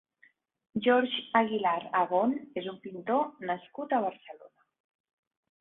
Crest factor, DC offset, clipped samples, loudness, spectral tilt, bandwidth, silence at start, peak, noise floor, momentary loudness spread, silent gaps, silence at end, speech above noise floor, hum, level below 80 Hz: 20 dB; under 0.1%; under 0.1%; -30 LUFS; -8.5 dB/octave; 4.1 kHz; 0.75 s; -10 dBFS; -66 dBFS; 13 LU; none; 1.15 s; 36 dB; none; -76 dBFS